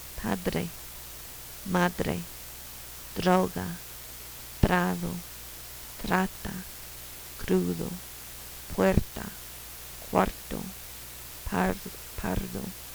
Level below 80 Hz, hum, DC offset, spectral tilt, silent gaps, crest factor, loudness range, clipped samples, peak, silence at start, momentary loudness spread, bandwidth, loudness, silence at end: -42 dBFS; none; under 0.1%; -5 dB/octave; none; 26 dB; 3 LU; under 0.1%; -6 dBFS; 0 s; 15 LU; over 20 kHz; -32 LUFS; 0 s